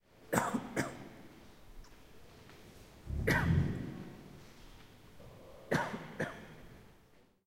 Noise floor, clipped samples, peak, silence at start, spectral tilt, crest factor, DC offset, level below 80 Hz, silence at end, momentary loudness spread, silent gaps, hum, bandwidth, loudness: -66 dBFS; under 0.1%; -12 dBFS; 0.2 s; -5.5 dB/octave; 28 dB; under 0.1%; -52 dBFS; 0.55 s; 26 LU; none; none; 16 kHz; -36 LUFS